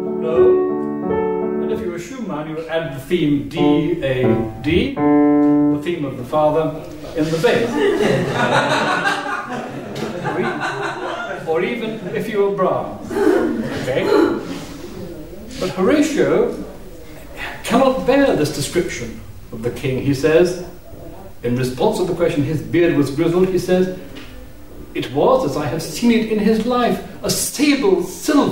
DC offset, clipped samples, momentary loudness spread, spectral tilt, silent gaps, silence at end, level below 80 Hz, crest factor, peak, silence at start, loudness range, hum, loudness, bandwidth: 0.8%; under 0.1%; 15 LU; -5.5 dB/octave; none; 0 s; -42 dBFS; 16 dB; -2 dBFS; 0 s; 4 LU; none; -18 LUFS; 16.5 kHz